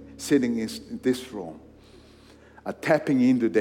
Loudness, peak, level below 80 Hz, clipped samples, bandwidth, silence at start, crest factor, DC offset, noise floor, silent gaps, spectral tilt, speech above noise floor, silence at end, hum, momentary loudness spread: -25 LUFS; -8 dBFS; -60 dBFS; under 0.1%; 16.5 kHz; 0 s; 18 dB; under 0.1%; -52 dBFS; none; -5.5 dB/octave; 27 dB; 0 s; none; 17 LU